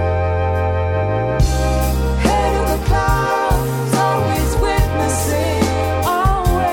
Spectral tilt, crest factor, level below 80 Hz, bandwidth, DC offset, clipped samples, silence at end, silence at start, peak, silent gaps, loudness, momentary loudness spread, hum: -5.5 dB/octave; 10 dB; -22 dBFS; 19.5 kHz; under 0.1%; under 0.1%; 0 s; 0 s; -4 dBFS; none; -17 LUFS; 2 LU; none